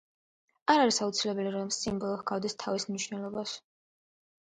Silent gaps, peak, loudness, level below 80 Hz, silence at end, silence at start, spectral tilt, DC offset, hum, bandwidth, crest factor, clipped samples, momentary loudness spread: none; -8 dBFS; -31 LUFS; -68 dBFS; 0.8 s; 0.65 s; -3.5 dB/octave; under 0.1%; none; 9.6 kHz; 24 dB; under 0.1%; 11 LU